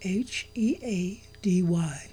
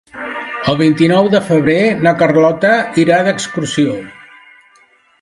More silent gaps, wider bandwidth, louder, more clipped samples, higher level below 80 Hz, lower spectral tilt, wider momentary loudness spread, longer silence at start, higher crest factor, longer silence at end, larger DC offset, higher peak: neither; about the same, 11.5 kHz vs 11.5 kHz; second, -28 LUFS vs -12 LUFS; neither; about the same, -56 dBFS vs -52 dBFS; about the same, -6 dB/octave vs -5.5 dB/octave; second, 8 LU vs 11 LU; second, 0 s vs 0.15 s; about the same, 12 dB vs 14 dB; second, 0 s vs 1 s; first, 0.1% vs under 0.1%; second, -16 dBFS vs 0 dBFS